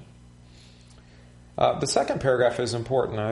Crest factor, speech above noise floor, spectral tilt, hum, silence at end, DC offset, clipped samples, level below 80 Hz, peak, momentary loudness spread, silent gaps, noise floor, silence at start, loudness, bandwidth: 20 dB; 27 dB; -4.5 dB/octave; 60 Hz at -50 dBFS; 0 s; under 0.1%; under 0.1%; -52 dBFS; -6 dBFS; 5 LU; none; -50 dBFS; 0 s; -24 LUFS; 11.5 kHz